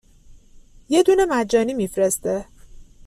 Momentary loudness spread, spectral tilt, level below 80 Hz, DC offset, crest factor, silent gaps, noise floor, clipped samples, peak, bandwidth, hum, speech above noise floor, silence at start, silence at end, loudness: 8 LU; -4 dB/octave; -48 dBFS; under 0.1%; 18 dB; none; -47 dBFS; under 0.1%; -4 dBFS; 15 kHz; none; 29 dB; 0.3 s; 0.25 s; -20 LUFS